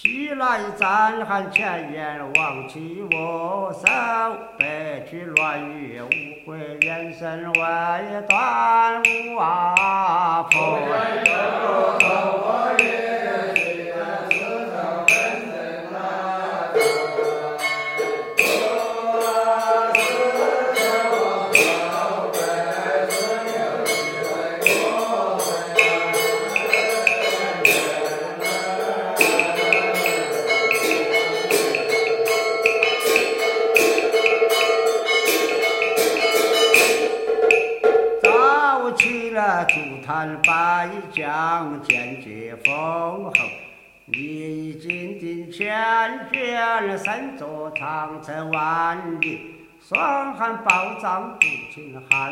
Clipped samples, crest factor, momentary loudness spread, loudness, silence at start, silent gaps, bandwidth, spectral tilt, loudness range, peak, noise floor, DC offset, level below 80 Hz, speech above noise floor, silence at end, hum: under 0.1%; 18 dB; 11 LU; -20 LUFS; 0 s; none; 16.5 kHz; -2.5 dB/octave; 6 LU; -2 dBFS; -44 dBFS; under 0.1%; -64 dBFS; 22 dB; 0 s; none